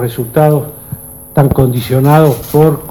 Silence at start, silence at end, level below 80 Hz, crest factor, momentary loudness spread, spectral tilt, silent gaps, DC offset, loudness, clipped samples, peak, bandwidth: 0 s; 0 s; -34 dBFS; 10 dB; 17 LU; -7.5 dB/octave; none; under 0.1%; -11 LUFS; 0.5%; 0 dBFS; 18 kHz